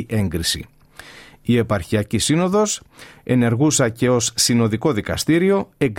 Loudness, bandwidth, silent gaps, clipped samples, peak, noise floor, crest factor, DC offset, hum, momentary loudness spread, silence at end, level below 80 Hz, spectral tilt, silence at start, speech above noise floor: -19 LUFS; 16.5 kHz; none; under 0.1%; -4 dBFS; -42 dBFS; 16 dB; under 0.1%; none; 6 LU; 0 s; -46 dBFS; -4.5 dB/octave; 0 s; 24 dB